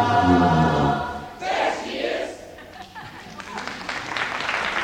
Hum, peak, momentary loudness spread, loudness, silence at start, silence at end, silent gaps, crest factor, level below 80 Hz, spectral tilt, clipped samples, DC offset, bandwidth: none; -6 dBFS; 21 LU; -23 LUFS; 0 s; 0 s; none; 18 dB; -44 dBFS; -5.5 dB/octave; under 0.1%; under 0.1%; 16 kHz